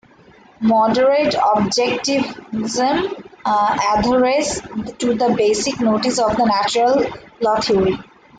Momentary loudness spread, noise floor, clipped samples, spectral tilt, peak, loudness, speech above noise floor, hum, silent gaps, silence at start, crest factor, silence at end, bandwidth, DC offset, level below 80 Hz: 8 LU; -47 dBFS; under 0.1%; -4 dB/octave; -6 dBFS; -17 LUFS; 31 dB; none; none; 0.6 s; 12 dB; 0.35 s; 9.4 kHz; under 0.1%; -46 dBFS